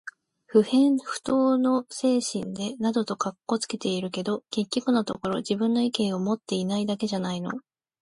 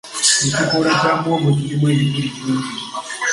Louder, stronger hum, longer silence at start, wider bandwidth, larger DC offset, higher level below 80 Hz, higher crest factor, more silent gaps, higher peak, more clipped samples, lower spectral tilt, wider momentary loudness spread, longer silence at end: second, -26 LUFS vs -17 LUFS; neither; about the same, 0.05 s vs 0.05 s; about the same, 11.5 kHz vs 11.5 kHz; neither; second, -66 dBFS vs -54 dBFS; about the same, 18 dB vs 18 dB; neither; second, -8 dBFS vs 0 dBFS; neither; about the same, -5 dB/octave vs -4 dB/octave; about the same, 9 LU vs 9 LU; first, 0.4 s vs 0 s